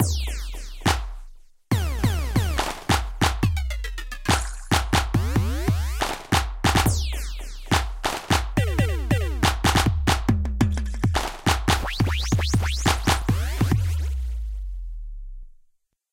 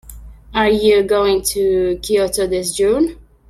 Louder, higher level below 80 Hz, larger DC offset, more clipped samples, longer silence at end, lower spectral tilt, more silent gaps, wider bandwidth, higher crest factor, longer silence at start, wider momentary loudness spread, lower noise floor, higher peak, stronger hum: second, -24 LUFS vs -16 LUFS; first, -28 dBFS vs -38 dBFS; neither; neither; first, 0.6 s vs 0.35 s; about the same, -4.5 dB/octave vs -3.5 dB/octave; neither; about the same, 17 kHz vs 15.5 kHz; about the same, 18 dB vs 14 dB; about the same, 0 s vs 0.05 s; first, 11 LU vs 5 LU; first, -62 dBFS vs -36 dBFS; about the same, -6 dBFS vs -4 dBFS; neither